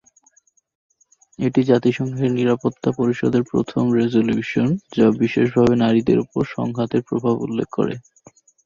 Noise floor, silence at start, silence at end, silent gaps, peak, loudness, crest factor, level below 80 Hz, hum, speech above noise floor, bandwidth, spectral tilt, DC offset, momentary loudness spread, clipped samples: -59 dBFS; 1.4 s; 0.65 s; none; -2 dBFS; -19 LUFS; 16 dB; -52 dBFS; none; 40 dB; 7.2 kHz; -8 dB/octave; under 0.1%; 7 LU; under 0.1%